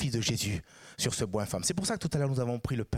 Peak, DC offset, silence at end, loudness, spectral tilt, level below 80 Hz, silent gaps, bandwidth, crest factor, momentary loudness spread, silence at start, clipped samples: -16 dBFS; under 0.1%; 0 s; -31 LUFS; -4.5 dB/octave; -52 dBFS; none; 16.5 kHz; 16 dB; 4 LU; 0 s; under 0.1%